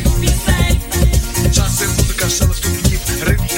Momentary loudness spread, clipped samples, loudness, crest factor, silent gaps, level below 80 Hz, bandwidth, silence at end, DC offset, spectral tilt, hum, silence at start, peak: 2 LU; under 0.1%; -15 LUFS; 14 dB; none; -18 dBFS; 17 kHz; 0 s; under 0.1%; -4 dB/octave; none; 0 s; 0 dBFS